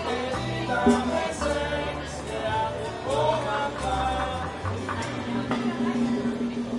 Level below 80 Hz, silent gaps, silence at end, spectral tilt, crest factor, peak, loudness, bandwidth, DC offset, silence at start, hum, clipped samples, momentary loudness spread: -44 dBFS; none; 0 s; -5.5 dB/octave; 20 dB; -6 dBFS; -27 LUFS; 11.5 kHz; under 0.1%; 0 s; none; under 0.1%; 7 LU